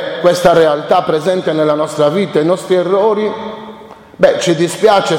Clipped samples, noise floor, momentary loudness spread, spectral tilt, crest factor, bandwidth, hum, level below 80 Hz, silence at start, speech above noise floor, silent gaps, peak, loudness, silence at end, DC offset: under 0.1%; -34 dBFS; 8 LU; -5 dB/octave; 12 dB; 16.5 kHz; none; -50 dBFS; 0 s; 23 dB; none; 0 dBFS; -12 LUFS; 0 s; under 0.1%